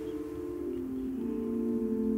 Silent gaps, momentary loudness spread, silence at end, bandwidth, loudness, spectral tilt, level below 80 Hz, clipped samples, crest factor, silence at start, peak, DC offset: none; 6 LU; 0 s; 16 kHz; -34 LUFS; -8.5 dB/octave; -54 dBFS; under 0.1%; 12 dB; 0 s; -20 dBFS; under 0.1%